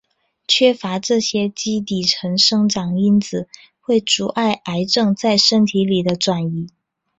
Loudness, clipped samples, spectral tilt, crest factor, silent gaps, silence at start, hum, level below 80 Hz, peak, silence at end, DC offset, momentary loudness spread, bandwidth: -17 LUFS; under 0.1%; -4.5 dB/octave; 16 dB; none; 0.5 s; none; -58 dBFS; -2 dBFS; 0.5 s; under 0.1%; 12 LU; 8.2 kHz